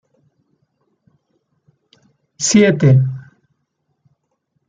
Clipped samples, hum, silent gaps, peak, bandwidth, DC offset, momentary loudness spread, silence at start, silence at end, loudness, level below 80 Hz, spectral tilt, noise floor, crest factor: under 0.1%; none; none; -2 dBFS; 9.4 kHz; under 0.1%; 12 LU; 2.4 s; 1.5 s; -13 LUFS; -56 dBFS; -5.5 dB/octave; -70 dBFS; 18 dB